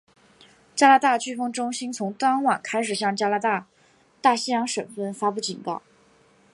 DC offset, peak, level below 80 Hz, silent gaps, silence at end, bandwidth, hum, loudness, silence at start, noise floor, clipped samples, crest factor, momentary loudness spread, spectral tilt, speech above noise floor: under 0.1%; -4 dBFS; -76 dBFS; none; 0.75 s; 11.5 kHz; none; -23 LUFS; 0.75 s; -59 dBFS; under 0.1%; 22 dB; 12 LU; -3 dB/octave; 37 dB